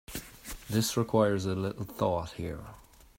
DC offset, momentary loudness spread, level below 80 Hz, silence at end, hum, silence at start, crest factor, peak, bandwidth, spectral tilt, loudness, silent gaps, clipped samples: under 0.1%; 17 LU; -54 dBFS; 0.35 s; none; 0.1 s; 20 dB; -12 dBFS; 16.5 kHz; -5.5 dB/octave; -31 LUFS; none; under 0.1%